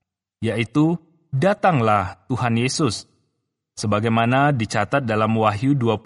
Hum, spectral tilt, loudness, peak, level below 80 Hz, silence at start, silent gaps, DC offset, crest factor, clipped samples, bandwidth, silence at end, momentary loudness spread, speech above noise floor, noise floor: none; -6 dB/octave; -20 LUFS; -4 dBFS; -56 dBFS; 0.4 s; none; under 0.1%; 18 dB; under 0.1%; 11.5 kHz; 0.05 s; 11 LU; 56 dB; -75 dBFS